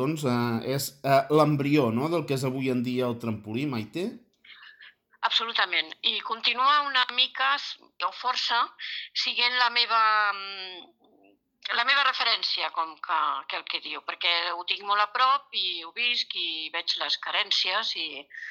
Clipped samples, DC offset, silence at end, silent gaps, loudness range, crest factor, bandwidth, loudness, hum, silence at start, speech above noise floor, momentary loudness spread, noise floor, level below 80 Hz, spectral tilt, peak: under 0.1%; under 0.1%; 0 s; none; 4 LU; 20 dB; 18 kHz; -25 LUFS; none; 0 s; 35 dB; 11 LU; -62 dBFS; -76 dBFS; -4 dB/octave; -8 dBFS